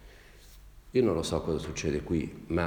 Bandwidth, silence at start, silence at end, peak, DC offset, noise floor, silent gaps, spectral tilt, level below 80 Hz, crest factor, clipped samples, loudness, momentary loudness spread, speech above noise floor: over 20 kHz; 0 s; 0 s; -14 dBFS; under 0.1%; -52 dBFS; none; -6 dB/octave; -48 dBFS; 18 dB; under 0.1%; -31 LUFS; 6 LU; 23 dB